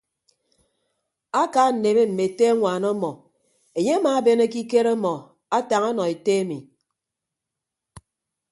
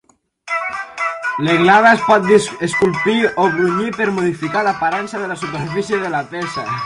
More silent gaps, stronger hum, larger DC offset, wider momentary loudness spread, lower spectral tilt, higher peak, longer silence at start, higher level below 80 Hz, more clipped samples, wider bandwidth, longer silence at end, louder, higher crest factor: neither; neither; neither; second, 9 LU vs 12 LU; about the same, -5.5 dB/octave vs -5 dB/octave; second, -6 dBFS vs 0 dBFS; first, 1.35 s vs 0.45 s; second, -68 dBFS vs -54 dBFS; neither; about the same, 11.5 kHz vs 11.5 kHz; first, 0.55 s vs 0 s; second, -21 LUFS vs -16 LUFS; about the same, 18 dB vs 16 dB